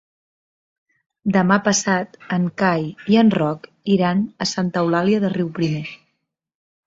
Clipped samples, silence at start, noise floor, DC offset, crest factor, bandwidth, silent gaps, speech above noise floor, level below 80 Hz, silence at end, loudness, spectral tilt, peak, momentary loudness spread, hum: under 0.1%; 1.25 s; -73 dBFS; under 0.1%; 18 dB; 7.8 kHz; none; 55 dB; -60 dBFS; 0.9 s; -19 LUFS; -5 dB/octave; -2 dBFS; 8 LU; none